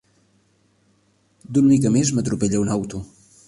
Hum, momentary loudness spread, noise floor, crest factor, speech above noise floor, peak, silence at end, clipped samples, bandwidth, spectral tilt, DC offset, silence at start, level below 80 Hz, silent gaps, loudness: none; 12 LU; -62 dBFS; 16 dB; 43 dB; -6 dBFS; 0.4 s; under 0.1%; 11.5 kHz; -6 dB/octave; under 0.1%; 1.5 s; -50 dBFS; none; -20 LUFS